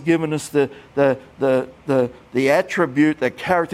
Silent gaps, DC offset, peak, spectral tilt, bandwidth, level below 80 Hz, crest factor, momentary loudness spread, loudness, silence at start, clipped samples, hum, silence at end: none; under 0.1%; -4 dBFS; -6 dB/octave; 15.5 kHz; -56 dBFS; 16 dB; 5 LU; -20 LUFS; 0 s; under 0.1%; none; 0 s